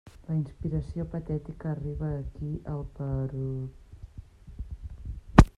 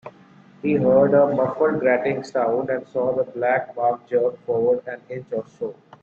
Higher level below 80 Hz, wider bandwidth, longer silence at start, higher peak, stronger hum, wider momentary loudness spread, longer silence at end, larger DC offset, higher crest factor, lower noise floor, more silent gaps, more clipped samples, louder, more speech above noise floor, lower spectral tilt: first, -34 dBFS vs -62 dBFS; first, 11 kHz vs 7.4 kHz; about the same, 0.05 s vs 0.05 s; first, -2 dBFS vs -6 dBFS; neither; about the same, 16 LU vs 14 LU; second, 0.1 s vs 0.3 s; neither; first, 28 dB vs 16 dB; about the same, -47 dBFS vs -49 dBFS; neither; neither; second, -32 LUFS vs -21 LUFS; second, 14 dB vs 29 dB; about the same, -8 dB/octave vs -8.5 dB/octave